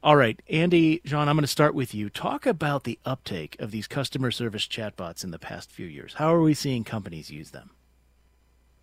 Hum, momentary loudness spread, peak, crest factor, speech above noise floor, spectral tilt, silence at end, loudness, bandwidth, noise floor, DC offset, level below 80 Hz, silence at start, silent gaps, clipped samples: none; 18 LU; -2 dBFS; 24 dB; 37 dB; -5.5 dB/octave; 1.2 s; -25 LUFS; 16 kHz; -62 dBFS; under 0.1%; -58 dBFS; 0.05 s; none; under 0.1%